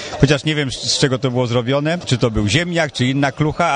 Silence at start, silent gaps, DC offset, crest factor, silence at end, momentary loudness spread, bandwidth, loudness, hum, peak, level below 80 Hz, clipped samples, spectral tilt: 0 s; none; under 0.1%; 16 dB; 0 s; 3 LU; 10 kHz; -17 LUFS; none; 0 dBFS; -36 dBFS; under 0.1%; -5 dB/octave